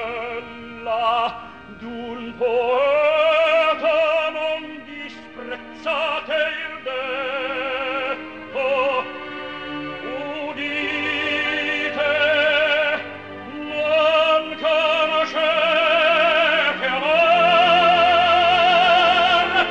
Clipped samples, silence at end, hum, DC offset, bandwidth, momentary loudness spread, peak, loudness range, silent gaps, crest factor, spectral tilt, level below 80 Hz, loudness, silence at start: under 0.1%; 0 s; none; 0.2%; 8.4 kHz; 17 LU; -4 dBFS; 9 LU; none; 16 dB; -3.5 dB/octave; -56 dBFS; -18 LUFS; 0 s